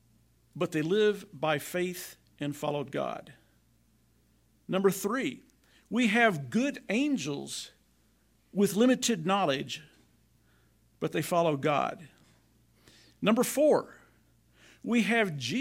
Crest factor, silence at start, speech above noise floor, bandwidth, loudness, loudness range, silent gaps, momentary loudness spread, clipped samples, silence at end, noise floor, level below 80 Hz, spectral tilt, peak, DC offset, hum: 20 dB; 0.55 s; 39 dB; 16 kHz; -29 LUFS; 5 LU; none; 14 LU; under 0.1%; 0 s; -68 dBFS; -70 dBFS; -4.5 dB/octave; -12 dBFS; under 0.1%; none